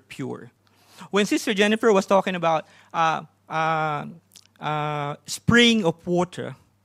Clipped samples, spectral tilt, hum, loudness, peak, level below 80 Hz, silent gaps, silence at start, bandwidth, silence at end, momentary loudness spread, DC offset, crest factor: under 0.1%; -4.5 dB/octave; none; -22 LUFS; -4 dBFS; -58 dBFS; none; 0.1 s; 15 kHz; 0.3 s; 16 LU; under 0.1%; 20 dB